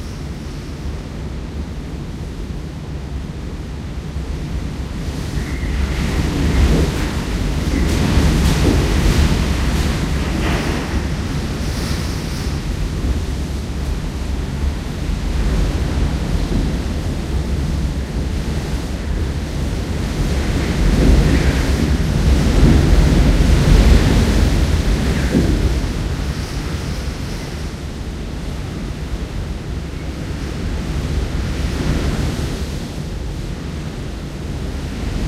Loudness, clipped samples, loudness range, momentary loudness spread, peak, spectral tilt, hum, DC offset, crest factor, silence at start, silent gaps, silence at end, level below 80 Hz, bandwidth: -20 LUFS; under 0.1%; 12 LU; 13 LU; 0 dBFS; -6 dB/octave; none; under 0.1%; 18 dB; 0 s; none; 0 s; -20 dBFS; 15 kHz